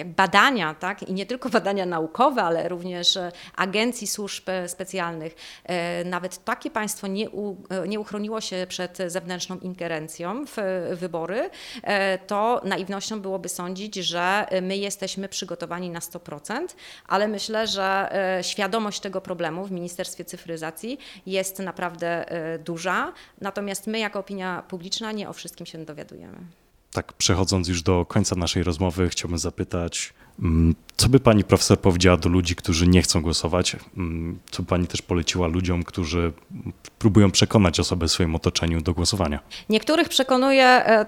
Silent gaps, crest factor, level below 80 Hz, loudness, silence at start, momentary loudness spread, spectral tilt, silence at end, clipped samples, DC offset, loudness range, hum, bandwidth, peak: none; 24 dB; -42 dBFS; -24 LUFS; 0 s; 15 LU; -4.5 dB/octave; 0 s; under 0.1%; under 0.1%; 9 LU; none; 17.5 kHz; 0 dBFS